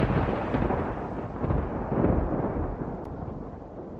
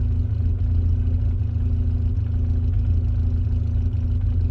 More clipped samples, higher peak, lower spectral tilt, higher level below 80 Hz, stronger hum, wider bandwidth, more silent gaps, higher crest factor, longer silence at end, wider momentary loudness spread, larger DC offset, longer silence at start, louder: neither; about the same, -10 dBFS vs -12 dBFS; about the same, -10 dB/octave vs -11 dB/octave; second, -36 dBFS vs -24 dBFS; neither; first, 6.6 kHz vs 3.1 kHz; neither; first, 18 dB vs 8 dB; about the same, 0 s vs 0 s; first, 12 LU vs 2 LU; neither; about the same, 0 s vs 0 s; second, -30 LUFS vs -23 LUFS